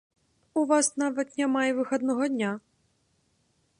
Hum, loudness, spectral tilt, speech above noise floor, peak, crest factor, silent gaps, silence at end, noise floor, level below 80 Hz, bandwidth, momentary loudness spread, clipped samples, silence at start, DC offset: none; -27 LUFS; -3.5 dB/octave; 44 dB; -12 dBFS; 18 dB; none; 1.2 s; -70 dBFS; -78 dBFS; 11.5 kHz; 8 LU; under 0.1%; 0.55 s; under 0.1%